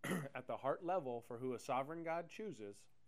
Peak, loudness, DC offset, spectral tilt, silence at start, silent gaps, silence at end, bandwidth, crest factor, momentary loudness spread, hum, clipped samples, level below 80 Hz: -26 dBFS; -44 LUFS; under 0.1%; -5.5 dB/octave; 0.05 s; none; 0.25 s; 15.5 kHz; 18 dB; 9 LU; none; under 0.1%; -82 dBFS